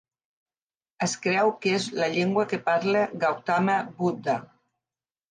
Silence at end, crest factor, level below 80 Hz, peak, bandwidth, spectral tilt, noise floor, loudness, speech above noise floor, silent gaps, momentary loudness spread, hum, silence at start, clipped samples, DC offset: 0.85 s; 16 dB; -74 dBFS; -10 dBFS; 10 kHz; -5 dB/octave; under -90 dBFS; -25 LUFS; over 65 dB; none; 6 LU; none; 1 s; under 0.1%; under 0.1%